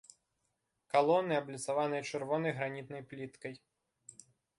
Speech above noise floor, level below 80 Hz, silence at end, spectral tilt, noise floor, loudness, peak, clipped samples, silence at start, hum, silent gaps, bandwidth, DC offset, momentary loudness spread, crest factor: 49 dB; -80 dBFS; 1 s; -5 dB/octave; -83 dBFS; -34 LUFS; -14 dBFS; under 0.1%; 0.95 s; none; none; 11.5 kHz; under 0.1%; 24 LU; 22 dB